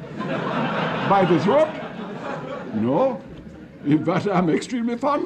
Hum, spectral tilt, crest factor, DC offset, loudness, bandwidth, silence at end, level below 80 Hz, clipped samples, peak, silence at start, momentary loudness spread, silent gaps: none; -7 dB/octave; 16 dB; under 0.1%; -22 LUFS; 9.4 kHz; 0 s; -56 dBFS; under 0.1%; -6 dBFS; 0 s; 14 LU; none